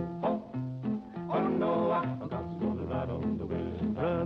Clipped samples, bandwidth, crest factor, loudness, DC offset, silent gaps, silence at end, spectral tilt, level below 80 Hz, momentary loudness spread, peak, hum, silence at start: under 0.1%; 5.8 kHz; 12 dB; -33 LUFS; under 0.1%; none; 0 s; -10 dB/octave; -54 dBFS; 7 LU; -20 dBFS; none; 0 s